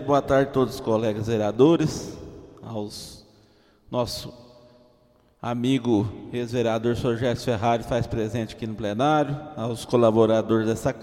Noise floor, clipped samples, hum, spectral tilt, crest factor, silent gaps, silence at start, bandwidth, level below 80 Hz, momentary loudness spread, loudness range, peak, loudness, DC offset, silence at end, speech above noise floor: -60 dBFS; under 0.1%; none; -6.5 dB/octave; 20 dB; none; 0 s; 16 kHz; -50 dBFS; 16 LU; 9 LU; -4 dBFS; -24 LUFS; under 0.1%; 0 s; 37 dB